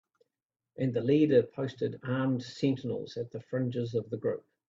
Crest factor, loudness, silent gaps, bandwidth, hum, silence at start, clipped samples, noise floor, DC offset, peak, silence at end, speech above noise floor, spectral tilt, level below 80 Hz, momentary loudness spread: 20 dB; -31 LUFS; none; 7.6 kHz; none; 0.8 s; under 0.1%; -89 dBFS; under 0.1%; -12 dBFS; 0.3 s; 59 dB; -8 dB/octave; -70 dBFS; 11 LU